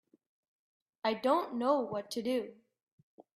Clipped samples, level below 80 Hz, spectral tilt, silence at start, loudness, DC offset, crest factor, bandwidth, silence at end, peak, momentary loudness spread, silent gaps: under 0.1%; -82 dBFS; -5 dB/octave; 1.05 s; -33 LUFS; under 0.1%; 20 dB; 14.5 kHz; 0.15 s; -16 dBFS; 7 LU; 2.83-3.18 s